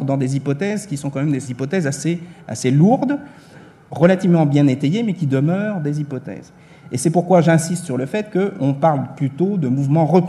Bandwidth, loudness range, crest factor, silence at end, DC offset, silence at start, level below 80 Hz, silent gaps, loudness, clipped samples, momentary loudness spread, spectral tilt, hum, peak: 12.5 kHz; 2 LU; 18 dB; 0 s; under 0.1%; 0 s; -62 dBFS; none; -18 LUFS; under 0.1%; 11 LU; -7 dB/octave; none; 0 dBFS